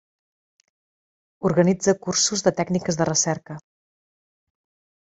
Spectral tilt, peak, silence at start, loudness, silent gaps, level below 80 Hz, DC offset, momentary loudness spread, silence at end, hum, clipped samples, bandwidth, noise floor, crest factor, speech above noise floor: -4 dB/octave; -4 dBFS; 1.4 s; -21 LUFS; none; -60 dBFS; under 0.1%; 10 LU; 1.45 s; none; under 0.1%; 8.2 kHz; under -90 dBFS; 22 dB; over 69 dB